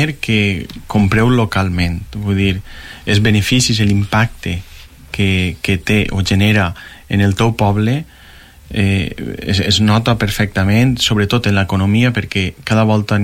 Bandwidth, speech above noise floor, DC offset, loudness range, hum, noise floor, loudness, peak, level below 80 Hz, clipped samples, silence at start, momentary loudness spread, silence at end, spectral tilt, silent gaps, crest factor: 16 kHz; 26 dB; under 0.1%; 2 LU; none; -40 dBFS; -15 LUFS; -2 dBFS; -34 dBFS; under 0.1%; 0 s; 10 LU; 0 s; -5.5 dB/octave; none; 12 dB